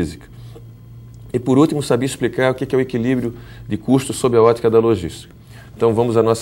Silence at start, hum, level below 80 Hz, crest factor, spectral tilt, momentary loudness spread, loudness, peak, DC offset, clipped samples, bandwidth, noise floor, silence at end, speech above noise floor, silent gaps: 0 s; none; -46 dBFS; 18 dB; -6.5 dB/octave; 21 LU; -17 LUFS; 0 dBFS; under 0.1%; under 0.1%; 16.5 kHz; -38 dBFS; 0 s; 22 dB; none